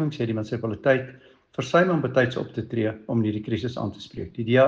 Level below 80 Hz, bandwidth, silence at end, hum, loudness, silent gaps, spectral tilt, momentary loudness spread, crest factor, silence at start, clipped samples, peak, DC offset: -58 dBFS; 7.6 kHz; 0 s; none; -25 LUFS; none; -7 dB/octave; 12 LU; 18 dB; 0 s; under 0.1%; -6 dBFS; under 0.1%